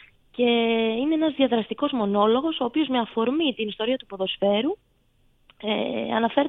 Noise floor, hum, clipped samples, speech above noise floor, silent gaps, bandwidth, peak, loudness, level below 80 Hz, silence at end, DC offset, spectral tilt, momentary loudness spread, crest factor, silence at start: -63 dBFS; none; under 0.1%; 40 dB; none; 4.1 kHz; -6 dBFS; -24 LUFS; -62 dBFS; 0 s; under 0.1%; -8.5 dB/octave; 7 LU; 18 dB; 0.4 s